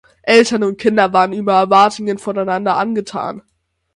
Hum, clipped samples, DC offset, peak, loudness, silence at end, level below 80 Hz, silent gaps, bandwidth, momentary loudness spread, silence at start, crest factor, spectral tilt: none; under 0.1%; under 0.1%; 0 dBFS; -14 LUFS; 0.55 s; -58 dBFS; none; 11.5 kHz; 12 LU; 0.25 s; 16 dB; -4.5 dB/octave